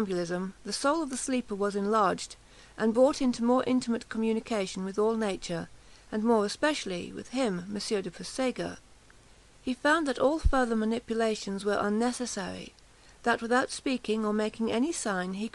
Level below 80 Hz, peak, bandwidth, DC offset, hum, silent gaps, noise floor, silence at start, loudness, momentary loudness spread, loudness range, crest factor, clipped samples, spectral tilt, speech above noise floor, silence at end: -46 dBFS; -12 dBFS; 12 kHz; under 0.1%; none; none; -56 dBFS; 0 s; -29 LUFS; 11 LU; 3 LU; 18 dB; under 0.1%; -4.5 dB/octave; 27 dB; 0.05 s